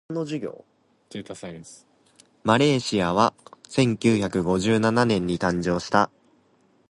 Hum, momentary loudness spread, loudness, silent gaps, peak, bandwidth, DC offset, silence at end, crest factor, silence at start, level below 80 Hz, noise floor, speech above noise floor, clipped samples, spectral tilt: none; 17 LU; -23 LUFS; none; -2 dBFS; 11.5 kHz; under 0.1%; 0.85 s; 22 dB; 0.1 s; -52 dBFS; -62 dBFS; 39 dB; under 0.1%; -5.5 dB/octave